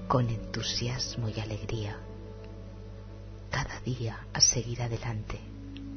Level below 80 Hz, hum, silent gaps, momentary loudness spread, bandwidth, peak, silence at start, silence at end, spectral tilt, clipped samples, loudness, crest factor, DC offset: -46 dBFS; 50 Hz at -45 dBFS; none; 22 LU; 6.6 kHz; -8 dBFS; 0 s; 0 s; -3.5 dB/octave; under 0.1%; -30 LUFS; 24 dB; under 0.1%